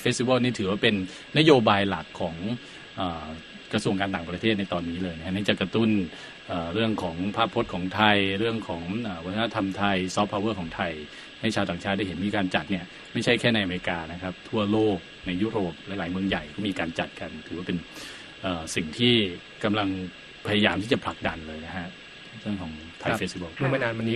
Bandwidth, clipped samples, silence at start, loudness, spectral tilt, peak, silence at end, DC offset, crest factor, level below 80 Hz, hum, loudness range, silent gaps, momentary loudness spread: 12 kHz; under 0.1%; 0 s; -27 LUFS; -5.5 dB/octave; -2 dBFS; 0 s; under 0.1%; 24 dB; -54 dBFS; none; 4 LU; none; 13 LU